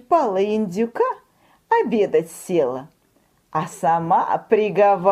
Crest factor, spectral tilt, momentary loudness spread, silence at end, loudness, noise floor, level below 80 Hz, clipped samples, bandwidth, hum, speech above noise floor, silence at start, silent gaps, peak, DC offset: 18 dB; -6 dB/octave; 10 LU; 0 s; -20 LUFS; -61 dBFS; -66 dBFS; under 0.1%; 15 kHz; none; 42 dB; 0.1 s; none; -2 dBFS; under 0.1%